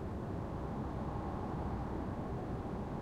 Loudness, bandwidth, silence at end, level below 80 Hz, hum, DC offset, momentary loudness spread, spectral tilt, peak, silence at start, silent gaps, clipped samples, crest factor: -41 LUFS; 12.5 kHz; 0 s; -48 dBFS; none; under 0.1%; 1 LU; -9 dB/octave; -28 dBFS; 0 s; none; under 0.1%; 12 dB